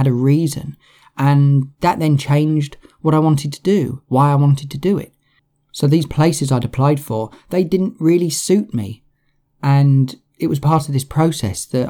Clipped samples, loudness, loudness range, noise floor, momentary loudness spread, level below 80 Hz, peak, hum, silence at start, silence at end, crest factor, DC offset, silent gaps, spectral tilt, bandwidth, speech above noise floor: under 0.1%; -17 LUFS; 2 LU; -63 dBFS; 10 LU; -48 dBFS; -2 dBFS; none; 0 s; 0 s; 14 dB; under 0.1%; none; -7 dB/octave; 15.5 kHz; 47 dB